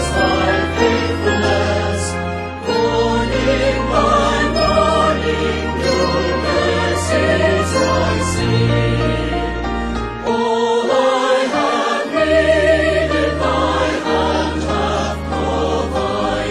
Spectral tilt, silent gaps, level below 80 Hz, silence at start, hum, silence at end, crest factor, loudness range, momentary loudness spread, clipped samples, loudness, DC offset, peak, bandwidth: -5 dB/octave; none; -28 dBFS; 0 s; none; 0 s; 14 dB; 2 LU; 6 LU; under 0.1%; -16 LUFS; under 0.1%; -2 dBFS; 12.5 kHz